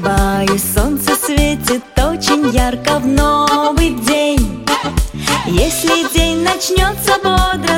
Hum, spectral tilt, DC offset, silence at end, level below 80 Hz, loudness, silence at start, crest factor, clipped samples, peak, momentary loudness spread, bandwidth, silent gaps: none; -4 dB/octave; under 0.1%; 0 s; -20 dBFS; -14 LUFS; 0 s; 14 dB; under 0.1%; 0 dBFS; 4 LU; 17 kHz; none